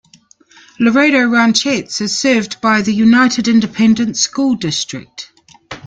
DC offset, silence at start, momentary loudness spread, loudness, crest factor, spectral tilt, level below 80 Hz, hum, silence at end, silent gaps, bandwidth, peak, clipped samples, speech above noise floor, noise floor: under 0.1%; 0.8 s; 14 LU; -13 LUFS; 14 dB; -3.5 dB/octave; -54 dBFS; none; 0.1 s; none; 9.2 kHz; 0 dBFS; under 0.1%; 35 dB; -48 dBFS